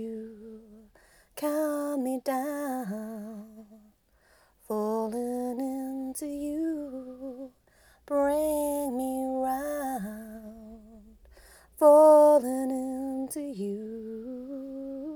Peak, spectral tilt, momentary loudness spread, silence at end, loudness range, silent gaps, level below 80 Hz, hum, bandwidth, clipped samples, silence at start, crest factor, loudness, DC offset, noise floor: -8 dBFS; -5.5 dB/octave; 22 LU; 0 s; 11 LU; none; -62 dBFS; none; over 20 kHz; under 0.1%; 0 s; 20 dB; -27 LUFS; under 0.1%; -64 dBFS